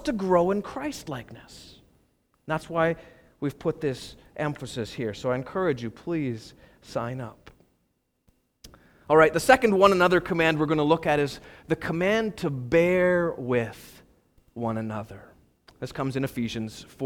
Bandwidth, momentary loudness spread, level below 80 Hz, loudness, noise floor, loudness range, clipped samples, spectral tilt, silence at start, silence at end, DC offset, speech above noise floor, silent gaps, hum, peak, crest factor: 17.5 kHz; 18 LU; -54 dBFS; -25 LUFS; -73 dBFS; 11 LU; under 0.1%; -6 dB/octave; 0 s; 0 s; under 0.1%; 48 dB; none; none; -4 dBFS; 22 dB